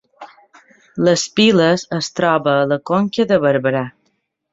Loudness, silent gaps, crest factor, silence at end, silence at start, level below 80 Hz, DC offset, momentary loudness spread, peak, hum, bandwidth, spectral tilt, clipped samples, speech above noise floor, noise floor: -16 LUFS; none; 16 dB; 0.65 s; 0.2 s; -58 dBFS; under 0.1%; 9 LU; -2 dBFS; none; 8 kHz; -5 dB/octave; under 0.1%; 52 dB; -67 dBFS